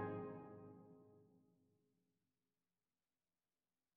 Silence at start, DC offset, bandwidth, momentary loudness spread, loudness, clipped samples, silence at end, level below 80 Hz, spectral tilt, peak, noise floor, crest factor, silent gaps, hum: 0 s; under 0.1%; 4.2 kHz; 17 LU; -54 LUFS; under 0.1%; 2.55 s; -88 dBFS; -8 dB/octave; -36 dBFS; under -90 dBFS; 22 dB; none; none